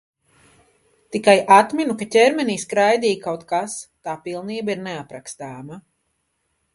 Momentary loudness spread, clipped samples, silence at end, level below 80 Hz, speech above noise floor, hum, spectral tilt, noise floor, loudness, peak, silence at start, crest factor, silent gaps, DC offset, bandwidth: 20 LU; under 0.1%; 0.95 s; -66 dBFS; 52 dB; none; -4 dB/octave; -71 dBFS; -19 LUFS; 0 dBFS; 1.1 s; 20 dB; none; under 0.1%; 11.5 kHz